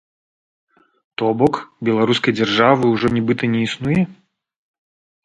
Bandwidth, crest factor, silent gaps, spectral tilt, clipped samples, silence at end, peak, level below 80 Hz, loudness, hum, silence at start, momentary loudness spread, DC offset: 9.4 kHz; 18 dB; none; -6.5 dB/octave; under 0.1%; 1.1 s; 0 dBFS; -52 dBFS; -18 LUFS; none; 1.2 s; 8 LU; under 0.1%